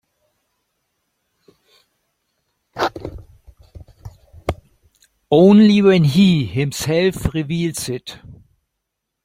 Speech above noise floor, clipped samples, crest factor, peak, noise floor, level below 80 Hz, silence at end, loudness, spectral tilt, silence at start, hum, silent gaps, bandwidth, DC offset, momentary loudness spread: 64 dB; under 0.1%; 18 dB; -2 dBFS; -78 dBFS; -42 dBFS; 0.9 s; -16 LUFS; -6.5 dB/octave; 2.75 s; none; none; 16 kHz; under 0.1%; 22 LU